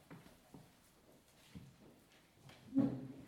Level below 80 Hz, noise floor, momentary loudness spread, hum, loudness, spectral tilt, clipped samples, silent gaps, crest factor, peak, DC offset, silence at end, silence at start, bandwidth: -74 dBFS; -67 dBFS; 27 LU; none; -39 LUFS; -7.5 dB/octave; under 0.1%; none; 22 dB; -24 dBFS; under 0.1%; 0 s; 0.1 s; 15.5 kHz